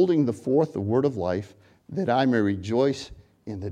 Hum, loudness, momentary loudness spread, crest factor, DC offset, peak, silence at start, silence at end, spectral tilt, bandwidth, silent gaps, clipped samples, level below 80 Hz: none; -25 LUFS; 16 LU; 16 dB; under 0.1%; -8 dBFS; 0 s; 0 s; -7.5 dB/octave; 10 kHz; none; under 0.1%; -58 dBFS